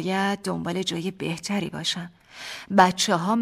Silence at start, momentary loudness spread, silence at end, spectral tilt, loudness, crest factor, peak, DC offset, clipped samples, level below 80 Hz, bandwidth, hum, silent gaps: 0 s; 17 LU; 0 s; -4 dB/octave; -24 LUFS; 22 dB; -4 dBFS; under 0.1%; under 0.1%; -62 dBFS; 15.5 kHz; none; none